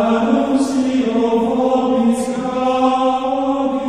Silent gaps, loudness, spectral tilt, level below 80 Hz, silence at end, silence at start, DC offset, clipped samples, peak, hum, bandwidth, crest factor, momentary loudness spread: none; -16 LUFS; -5.5 dB/octave; -52 dBFS; 0 s; 0 s; 0.3%; under 0.1%; -4 dBFS; none; 11.5 kHz; 12 dB; 3 LU